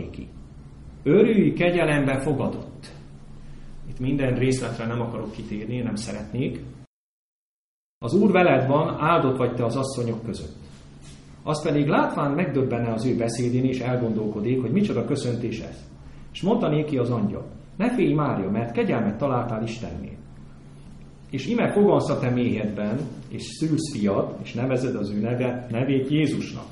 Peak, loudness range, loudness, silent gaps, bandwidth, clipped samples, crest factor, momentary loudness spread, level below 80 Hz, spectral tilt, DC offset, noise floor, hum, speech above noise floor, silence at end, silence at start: -4 dBFS; 5 LU; -24 LUFS; 6.87-8.01 s; 11.5 kHz; under 0.1%; 20 dB; 16 LU; -46 dBFS; -7 dB/octave; under 0.1%; -44 dBFS; none; 21 dB; 0 s; 0 s